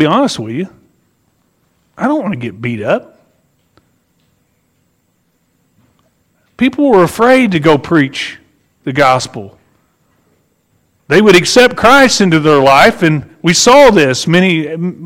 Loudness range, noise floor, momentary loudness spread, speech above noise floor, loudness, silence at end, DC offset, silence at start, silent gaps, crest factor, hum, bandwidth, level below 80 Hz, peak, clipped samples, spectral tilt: 13 LU; -60 dBFS; 14 LU; 50 dB; -10 LUFS; 0 s; under 0.1%; 0 s; none; 12 dB; none; 16.5 kHz; -44 dBFS; 0 dBFS; 0.1%; -4.5 dB/octave